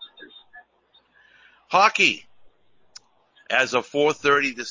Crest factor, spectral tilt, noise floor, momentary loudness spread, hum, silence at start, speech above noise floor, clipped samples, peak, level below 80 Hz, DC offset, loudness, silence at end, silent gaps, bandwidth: 22 dB; -2.5 dB/octave; -62 dBFS; 7 LU; none; 0 s; 41 dB; under 0.1%; -4 dBFS; -66 dBFS; under 0.1%; -20 LUFS; 0 s; none; 7.6 kHz